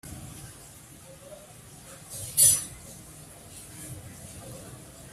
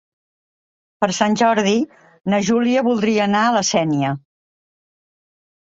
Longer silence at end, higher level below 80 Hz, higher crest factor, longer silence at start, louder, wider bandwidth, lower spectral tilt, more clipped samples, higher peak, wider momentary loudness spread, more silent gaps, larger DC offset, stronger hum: second, 0 s vs 1.5 s; about the same, -56 dBFS vs -60 dBFS; first, 28 dB vs 18 dB; second, 0.05 s vs 1 s; second, -21 LUFS vs -18 LUFS; first, 16 kHz vs 8 kHz; second, -1 dB/octave vs -4.5 dB/octave; neither; second, -6 dBFS vs -2 dBFS; first, 28 LU vs 8 LU; neither; neither; neither